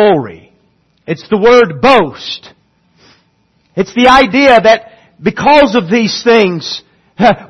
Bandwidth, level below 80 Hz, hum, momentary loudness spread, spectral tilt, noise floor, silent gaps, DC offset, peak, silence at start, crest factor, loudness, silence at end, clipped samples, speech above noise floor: 10.5 kHz; -40 dBFS; none; 16 LU; -5 dB/octave; -55 dBFS; none; under 0.1%; 0 dBFS; 0 s; 10 dB; -9 LUFS; 0.05 s; 0.4%; 47 dB